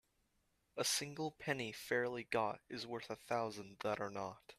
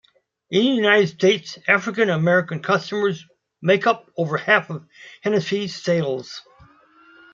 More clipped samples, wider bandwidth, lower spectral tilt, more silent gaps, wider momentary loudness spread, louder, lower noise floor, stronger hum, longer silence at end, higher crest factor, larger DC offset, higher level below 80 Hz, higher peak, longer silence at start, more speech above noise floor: neither; first, 14.5 kHz vs 7.6 kHz; second, -3 dB/octave vs -5.5 dB/octave; neither; second, 9 LU vs 12 LU; second, -41 LUFS vs -20 LUFS; first, -80 dBFS vs -52 dBFS; neither; second, 0.05 s vs 0.95 s; about the same, 20 dB vs 20 dB; neither; second, -78 dBFS vs -68 dBFS; second, -22 dBFS vs -2 dBFS; first, 0.75 s vs 0.5 s; first, 38 dB vs 32 dB